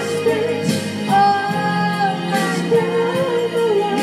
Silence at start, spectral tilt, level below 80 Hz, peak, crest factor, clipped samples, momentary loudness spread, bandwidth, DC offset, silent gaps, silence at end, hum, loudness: 0 s; -5.5 dB/octave; -66 dBFS; -4 dBFS; 14 dB; under 0.1%; 4 LU; 15.5 kHz; under 0.1%; none; 0 s; none; -18 LUFS